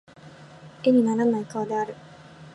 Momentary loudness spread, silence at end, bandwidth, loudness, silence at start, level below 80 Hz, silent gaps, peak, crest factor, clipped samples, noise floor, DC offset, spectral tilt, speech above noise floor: 12 LU; 0.05 s; 11 kHz; -24 LUFS; 0.25 s; -68 dBFS; none; -8 dBFS; 16 dB; under 0.1%; -47 dBFS; under 0.1%; -7 dB/octave; 24 dB